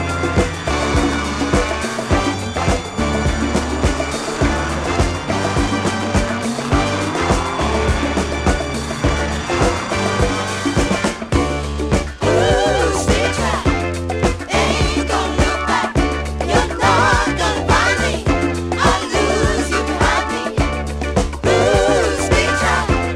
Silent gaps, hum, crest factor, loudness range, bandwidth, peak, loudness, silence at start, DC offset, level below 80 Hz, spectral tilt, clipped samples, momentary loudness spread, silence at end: none; none; 16 dB; 3 LU; 14 kHz; 0 dBFS; -17 LUFS; 0 s; under 0.1%; -24 dBFS; -4.5 dB/octave; under 0.1%; 5 LU; 0 s